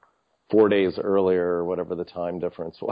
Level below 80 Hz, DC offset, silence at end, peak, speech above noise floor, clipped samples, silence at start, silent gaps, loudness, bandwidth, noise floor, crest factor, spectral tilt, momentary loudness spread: -56 dBFS; under 0.1%; 0 s; -6 dBFS; 42 dB; under 0.1%; 0.5 s; none; -24 LUFS; 5.2 kHz; -64 dBFS; 18 dB; -10 dB/octave; 11 LU